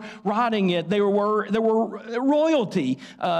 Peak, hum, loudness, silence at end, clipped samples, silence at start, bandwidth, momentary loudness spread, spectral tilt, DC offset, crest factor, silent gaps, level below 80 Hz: -12 dBFS; none; -23 LUFS; 0 s; under 0.1%; 0 s; 10 kHz; 6 LU; -6.5 dB/octave; under 0.1%; 10 dB; none; -68 dBFS